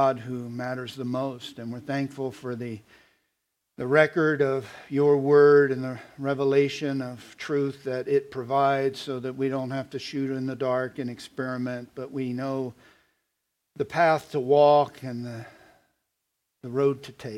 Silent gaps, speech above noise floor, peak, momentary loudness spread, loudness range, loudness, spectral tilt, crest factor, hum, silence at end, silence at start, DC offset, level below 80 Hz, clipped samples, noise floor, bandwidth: none; 55 dB; -4 dBFS; 16 LU; 9 LU; -26 LUFS; -6.5 dB/octave; 22 dB; none; 0 s; 0 s; under 0.1%; -72 dBFS; under 0.1%; -80 dBFS; 12.5 kHz